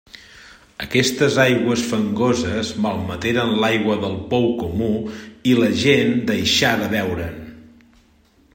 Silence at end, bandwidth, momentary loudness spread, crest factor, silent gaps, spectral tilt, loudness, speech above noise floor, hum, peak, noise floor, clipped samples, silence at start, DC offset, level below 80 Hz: 0.9 s; 16.5 kHz; 9 LU; 18 dB; none; -4.5 dB/octave; -19 LUFS; 37 dB; none; -2 dBFS; -55 dBFS; under 0.1%; 0.15 s; under 0.1%; -50 dBFS